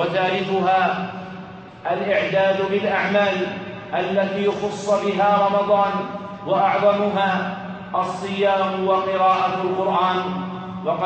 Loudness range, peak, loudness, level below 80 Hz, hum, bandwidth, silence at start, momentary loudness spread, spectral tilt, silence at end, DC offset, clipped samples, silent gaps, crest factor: 1 LU; -6 dBFS; -20 LUFS; -62 dBFS; none; 8.4 kHz; 0 s; 11 LU; -6 dB/octave; 0 s; under 0.1%; under 0.1%; none; 14 dB